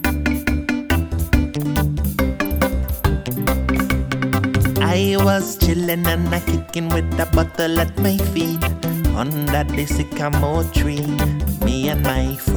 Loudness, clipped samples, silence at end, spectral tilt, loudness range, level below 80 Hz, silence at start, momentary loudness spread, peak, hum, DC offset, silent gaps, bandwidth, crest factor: -19 LUFS; under 0.1%; 0 s; -6 dB/octave; 2 LU; -24 dBFS; 0 s; 3 LU; -2 dBFS; none; under 0.1%; none; over 20 kHz; 16 dB